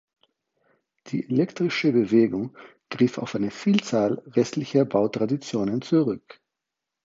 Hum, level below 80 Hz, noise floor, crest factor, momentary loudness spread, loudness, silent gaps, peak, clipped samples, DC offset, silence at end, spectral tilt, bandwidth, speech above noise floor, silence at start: none; -66 dBFS; -85 dBFS; 18 dB; 10 LU; -24 LUFS; none; -6 dBFS; under 0.1%; under 0.1%; 0.85 s; -6.5 dB/octave; 7.8 kHz; 62 dB; 1.05 s